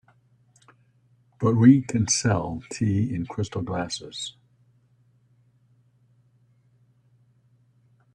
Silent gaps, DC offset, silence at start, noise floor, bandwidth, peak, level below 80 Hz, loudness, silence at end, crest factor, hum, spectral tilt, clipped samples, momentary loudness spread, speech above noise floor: none; under 0.1%; 1.4 s; -62 dBFS; 10.5 kHz; -4 dBFS; -58 dBFS; -24 LUFS; 3.85 s; 24 dB; none; -5.5 dB/octave; under 0.1%; 16 LU; 40 dB